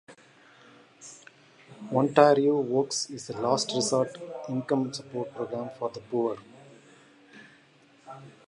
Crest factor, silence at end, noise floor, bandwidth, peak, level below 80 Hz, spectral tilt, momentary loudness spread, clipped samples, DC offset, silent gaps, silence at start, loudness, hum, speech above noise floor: 24 dB; 0.2 s; -59 dBFS; 11.5 kHz; -4 dBFS; -74 dBFS; -4.5 dB/octave; 26 LU; under 0.1%; under 0.1%; none; 0.1 s; -27 LUFS; none; 32 dB